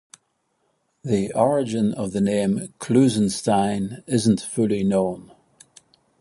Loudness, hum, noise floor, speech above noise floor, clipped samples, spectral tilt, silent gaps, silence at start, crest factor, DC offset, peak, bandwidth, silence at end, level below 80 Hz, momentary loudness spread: -22 LUFS; none; -70 dBFS; 50 dB; under 0.1%; -6 dB/octave; none; 1.05 s; 18 dB; under 0.1%; -4 dBFS; 11.5 kHz; 1 s; -56 dBFS; 8 LU